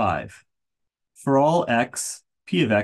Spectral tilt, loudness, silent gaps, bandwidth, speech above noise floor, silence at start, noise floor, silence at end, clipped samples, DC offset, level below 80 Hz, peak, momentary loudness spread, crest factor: -5 dB/octave; -23 LUFS; none; 12.5 kHz; 60 dB; 0 s; -82 dBFS; 0 s; under 0.1%; under 0.1%; -52 dBFS; -8 dBFS; 14 LU; 16 dB